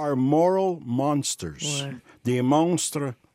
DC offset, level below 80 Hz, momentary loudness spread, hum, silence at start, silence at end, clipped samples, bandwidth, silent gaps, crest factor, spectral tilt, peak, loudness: under 0.1%; -62 dBFS; 9 LU; none; 0 s; 0.2 s; under 0.1%; 16 kHz; none; 16 dB; -5 dB/octave; -10 dBFS; -24 LUFS